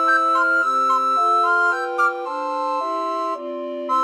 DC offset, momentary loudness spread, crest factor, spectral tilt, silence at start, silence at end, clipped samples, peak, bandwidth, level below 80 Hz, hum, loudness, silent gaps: under 0.1%; 10 LU; 12 dB; -1 dB/octave; 0 s; 0 s; under 0.1%; -8 dBFS; 12.5 kHz; -86 dBFS; none; -19 LUFS; none